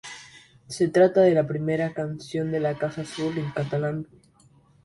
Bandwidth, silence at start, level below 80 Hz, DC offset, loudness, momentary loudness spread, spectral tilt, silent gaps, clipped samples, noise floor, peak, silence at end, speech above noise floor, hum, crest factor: 11.5 kHz; 0.05 s; -62 dBFS; under 0.1%; -24 LUFS; 17 LU; -6.5 dB/octave; none; under 0.1%; -58 dBFS; -6 dBFS; 0.8 s; 34 dB; none; 18 dB